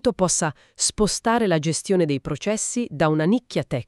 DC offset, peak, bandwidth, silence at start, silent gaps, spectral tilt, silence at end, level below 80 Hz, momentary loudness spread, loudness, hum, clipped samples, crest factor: under 0.1%; -6 dBFS; 13 kHz; 0.05 s; none; -4.5 dB/octave; 0.05 s; -46 dBFS; 5 LU; -22 LUFS; none; under 0.1%; 16 dB